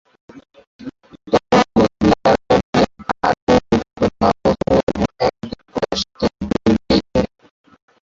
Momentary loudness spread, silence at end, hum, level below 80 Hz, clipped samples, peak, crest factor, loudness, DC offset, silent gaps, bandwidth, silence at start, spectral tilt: 11 LU; 0.8 s; none; -38 dBFS; under 0.1%; -2 dBFS; 16 dB; -17 LUFS; under 0.1%; 0.67-0.79 s, 2.63-2.73 s, 3.42-3.47 s, 4.83-4.87 s; 7.8 kHz; 0.35 s; -6 dB/octave